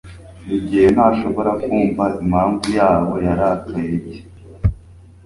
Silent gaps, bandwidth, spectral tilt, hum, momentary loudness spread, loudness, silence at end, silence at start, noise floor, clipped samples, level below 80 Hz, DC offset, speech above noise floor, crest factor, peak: none; 11.5 kHz; -7.5 dB/octave; none; 10 LU; -17 LUFS; 0.3 s; 0.05 s; -42 dBFS; under 0.1%; -34 dBFS; under 0.1%; 26 dB; 16 dB; -2 dBFS